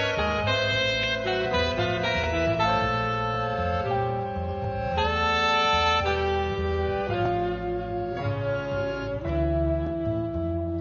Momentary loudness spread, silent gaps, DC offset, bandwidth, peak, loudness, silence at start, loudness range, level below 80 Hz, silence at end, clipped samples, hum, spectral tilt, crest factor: 8 LU; none; under 0.1%; 7.2 kHz; -10 dBFS; -26 LUFS; 0 s; 4 LU; -38 dBFS; 0 s; under 0.1%; none; -5.5 dB/octave; 16 dB